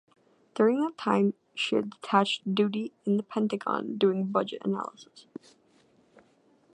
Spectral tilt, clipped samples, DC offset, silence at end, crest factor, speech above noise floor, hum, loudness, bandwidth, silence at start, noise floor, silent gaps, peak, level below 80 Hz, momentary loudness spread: -6 dB/octave; under 0.1%; under 0.1%; 1.55 s; 22 dB; 36 dB; none; -28 LUFS; 9.4 kHz; 0.55 s; -64 dBFS; none; -8 dBFS; -80 dBFS; 15 LU